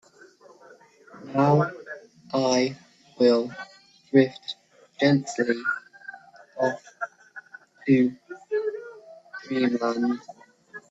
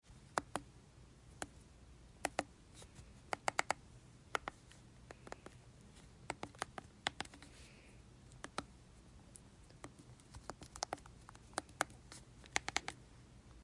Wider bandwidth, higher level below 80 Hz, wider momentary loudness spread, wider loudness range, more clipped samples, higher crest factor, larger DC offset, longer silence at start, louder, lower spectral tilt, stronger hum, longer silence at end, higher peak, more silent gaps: second, 8 kHz vs 11.5 kHz; second, -70 dBFS vs -64 dBFS; first, 23 LU vs 20 LU; second, 4 LU vs 7 LU; neither; second, 22 dB vs 36 dB; neither; first, 1.15 s vs 0.05 s; first, -25 LUFS vs -45 LUFS; first, -6 dB/octave vs -2.5 dB/octave; neither; about the same, 0.1 s vs 0 s; first, -6 dBFS vs -14 dBFS; neither